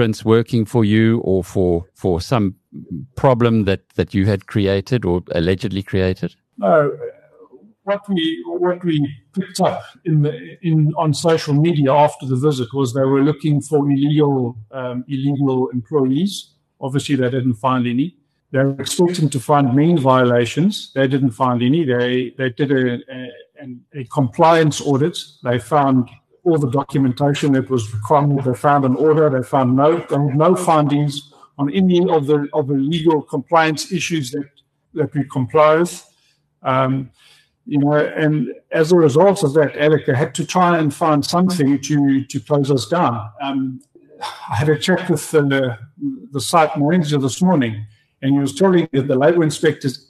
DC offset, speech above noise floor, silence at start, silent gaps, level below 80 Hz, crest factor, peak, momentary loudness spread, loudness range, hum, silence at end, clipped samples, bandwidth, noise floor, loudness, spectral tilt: under 0.1%; 45 dB; 0 s; none; -52 dBFS; 16 dB; -2 dBFS; 11 LU; 4 LU; none; 0.15 s; under 0.1%; 13 kHz; -61 dBFS; -17 LUFS; -6.5 dB/octave